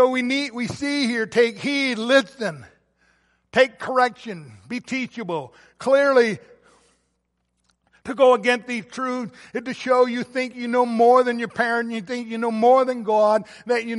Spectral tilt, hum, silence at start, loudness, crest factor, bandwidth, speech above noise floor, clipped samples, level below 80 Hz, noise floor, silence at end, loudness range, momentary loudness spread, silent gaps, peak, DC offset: -4.5 dB/octave; none; 0 s; -21 LUFS; 18 dB; 11.5 kHz; 52 dB; under 0.1%; -66 dBFS; -73 dBFS; 0 s; 4 LU; 14 LU; none; -4 dBFS; under 0.1%